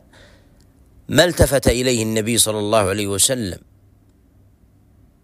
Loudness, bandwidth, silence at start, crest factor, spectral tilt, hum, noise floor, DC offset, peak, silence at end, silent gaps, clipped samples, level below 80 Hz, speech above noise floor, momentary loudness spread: -17 LUFS; 16 kHz; 1.1 s; 20 dB; -3.5 dB/octave; none; -53 dBFS; under 0.1%; 0 dBFS; 1.65 s; none; under 0.1%; -36 dBFS; 36 dB; 6 LU